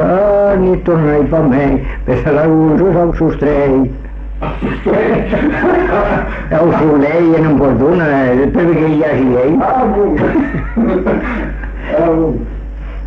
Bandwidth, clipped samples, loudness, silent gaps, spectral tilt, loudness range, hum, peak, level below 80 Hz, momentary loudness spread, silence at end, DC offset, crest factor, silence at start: 6.4 kHz; under 0.1%; -12 LUFS; none; -10 dB/octave; 3 LU; none; -2 dBFS; -24 dBFS; 9 LU; 0 s; under 0.1%; 8 dB; 0 s